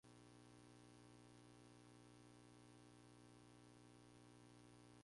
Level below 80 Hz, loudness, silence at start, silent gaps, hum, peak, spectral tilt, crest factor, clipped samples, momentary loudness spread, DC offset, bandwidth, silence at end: -82 dBFS; -67 LUFS; 0.05 s; none; 60 Hz at -70 dBFS; -54 dBFS; -5 dB/octave; 12 dB; under 0.1%; 1 LU; under 0.1%; 11.5 kHz; 0 s